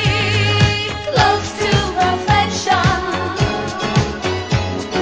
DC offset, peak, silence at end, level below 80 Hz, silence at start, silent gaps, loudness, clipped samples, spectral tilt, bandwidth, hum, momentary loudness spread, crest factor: 0.2%; 0 dBFS; 0 s; -32 dBFS; 0 s; none; -17 LUFS; under 0.1%; -4.5 dB/octave; 9.8 kHz; none; 6 LU; 16 dB